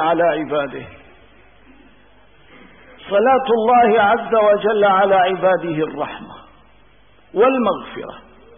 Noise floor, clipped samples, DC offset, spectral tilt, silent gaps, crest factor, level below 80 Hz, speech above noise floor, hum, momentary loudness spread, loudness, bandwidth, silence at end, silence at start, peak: -52 dBFS; under 0.1%; 0.2%; -10.5 dB/octave; none; 14 dB; -54 dBFS; 36 dB; none; 15 LU; -16 LUFS; 3.7 kHz; 0.4 s; 0 s; -4 dBFS